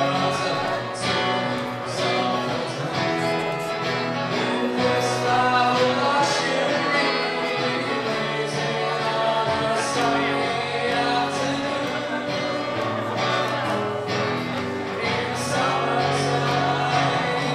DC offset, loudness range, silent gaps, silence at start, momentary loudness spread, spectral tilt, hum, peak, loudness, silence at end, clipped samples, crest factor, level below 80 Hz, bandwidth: under 0.1%; 4 LU; none; 0 s; 5 LU; -4.5 dB/octave; none; -6 dBFS; -23 LUFS; 0 s; under 0.1%; 16 dB; -58 dBFS; 15 kHz